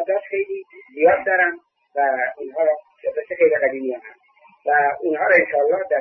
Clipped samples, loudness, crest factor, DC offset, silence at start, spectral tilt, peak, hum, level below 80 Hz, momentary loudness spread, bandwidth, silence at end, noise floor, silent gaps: under 0.1%; -20 LUFS; 18 dB; under 0.1%; 0 s; -7.5 dB/octave; -2 dBFS; none; -66 dBFS; 13 LU; 4.5 kHz; 0 s; -54 dBFS; none